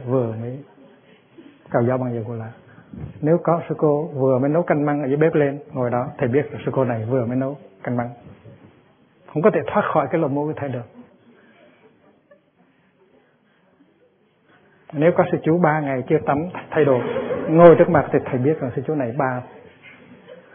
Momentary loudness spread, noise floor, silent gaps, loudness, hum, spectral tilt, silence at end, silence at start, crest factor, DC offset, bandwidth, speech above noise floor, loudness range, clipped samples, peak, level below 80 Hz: 13 LU; -59 dBFS; none; -20 LUFS; none; -12.5 dB/octave; 0.15 s; 0 s; 22 dB; under 0.1%; 3.6 kHz; 40 dB; 9 LU; under 0.1%; 0 dBFS; -58 dBFS